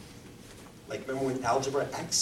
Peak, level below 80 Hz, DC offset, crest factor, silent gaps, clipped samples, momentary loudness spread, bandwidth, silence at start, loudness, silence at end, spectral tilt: -16 dBFS; -60 dBFS; under 0.1%; 18 dB; none; under 0.1%; 20 LU; 16.5 kHz; 0 s; -31 LUFS; 0 s; -3 dB/octave